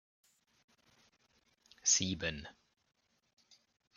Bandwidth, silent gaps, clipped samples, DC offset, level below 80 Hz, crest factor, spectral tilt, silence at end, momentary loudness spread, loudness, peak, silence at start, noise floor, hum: 11 kHz; none; under 0.1%; under 0.1%; -66 dBFS; 26 dB; -1.5 dB/octave; 1.45 s; 20 LU; -33 LUFS; -16 dBFS; 1.85 s; -74 dBFS; none